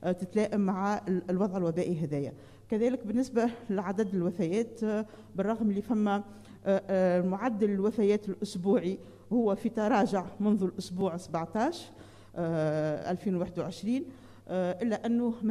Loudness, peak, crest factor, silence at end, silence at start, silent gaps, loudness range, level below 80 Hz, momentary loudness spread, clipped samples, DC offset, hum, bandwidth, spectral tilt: -31 LUFS; -12 dBFS; 18 dB; 0 s; 0 s; none; 4 LU; -64 dBFS; 8 LU; under 0.1%; under 0.1%; none; 12.5 kHz; -7.5 dB/octave